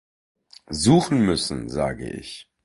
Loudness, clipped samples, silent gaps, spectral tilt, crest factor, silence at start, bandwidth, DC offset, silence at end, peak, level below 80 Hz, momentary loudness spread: -21 LUFS; under 0.1%; none; -5.5 dB/octave; 18 dB; 0.7 s; 11.5 kHz; under 0.1%; 0.2 s; -6 dBFS; -46 dBFS; 16 LU